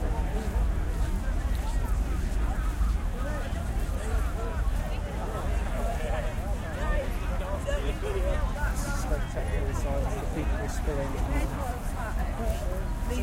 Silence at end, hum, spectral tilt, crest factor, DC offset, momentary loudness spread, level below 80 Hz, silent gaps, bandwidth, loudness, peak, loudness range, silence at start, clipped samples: 0 s; none; -6 dB/octave; 12 dB; under 0.1%; 3 LU; -30 dBFS; none; 16 kHz; -31 LUFS; -16 dBFS; 1 LU; 0 s; under 0.1%